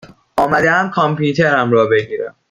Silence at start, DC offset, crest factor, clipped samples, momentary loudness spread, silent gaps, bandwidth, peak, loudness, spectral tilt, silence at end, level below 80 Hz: 0.05 s; under 0.1%; 14 dB; under 0.1%; 10 LU; none; 15 kHz; -2 dBFS; -14 LUFS; -6.5 dB/octave; 0.2 s; -52 dBFS